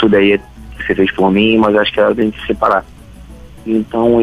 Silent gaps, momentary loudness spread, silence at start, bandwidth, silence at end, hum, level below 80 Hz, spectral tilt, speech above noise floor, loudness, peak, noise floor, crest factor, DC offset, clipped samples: none; 8 LU; 0 s; 11 kHz; 0 s; none; -38 dBFS; -7 dB/octave; 23 dB; -13 LUFS; -2 dBFS; -35 dBFS; 12 dB; under 0.1%; under 0.1%